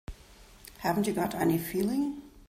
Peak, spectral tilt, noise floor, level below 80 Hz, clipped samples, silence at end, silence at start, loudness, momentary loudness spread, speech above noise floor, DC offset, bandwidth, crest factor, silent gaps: -14 dBFS; -6 dB/octave; -54 dBFS; -52 dBFS; under 0.1%; 0.05 s; 0.1 s; -30 LUFS; 21 LU; 25 dB; under 0.1%; 16 kHz; 16 dB; none